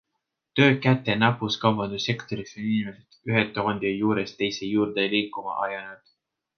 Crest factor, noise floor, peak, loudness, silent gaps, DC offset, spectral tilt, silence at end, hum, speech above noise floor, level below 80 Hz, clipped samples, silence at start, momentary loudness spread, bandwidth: 22 dB; -81 dBFS; -4 dBFS; -25 LUFS; none; under 0.1%; -6 dB/octave; 0.6 s; none; 56 dB; -62 dBFS; under 0.1%; 0.55 s; 10 LU; 6.8 kHz